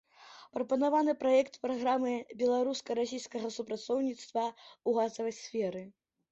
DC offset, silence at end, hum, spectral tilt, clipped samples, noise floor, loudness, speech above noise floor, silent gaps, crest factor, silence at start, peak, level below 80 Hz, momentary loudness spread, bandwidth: under 0.1%; 0.4 s; none; -4.5 dB/octave; under 0.1%; -56 dBFS; -33 LUFS; 24 dB; none; 16 dB; 0.2 s; -16 dBFS; -78 dBFS; 10 LU; 8.2 kHz